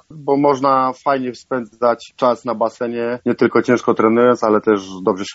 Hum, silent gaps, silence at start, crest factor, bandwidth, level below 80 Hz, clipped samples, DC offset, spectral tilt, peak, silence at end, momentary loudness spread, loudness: none; none; 0.1 s; 16 dB; 8 kHz; -62 dBFS; under 0.1%; under 0.1%; -5 dB/octave; 0 dBFS; 0 s; 8 LU; -17 LUFS